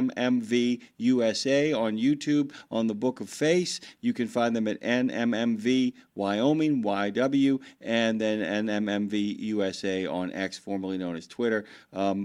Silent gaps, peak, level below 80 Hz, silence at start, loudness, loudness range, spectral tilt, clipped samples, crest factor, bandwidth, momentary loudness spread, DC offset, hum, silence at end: none; -10 dBFS; -70 dBFS; 0 s; -27 LUFS; 3 LU; -5 dB/octave; under 0.1%; 16 dB; 11.5 kHz; 7 LU; under 0.1%; none; 0 s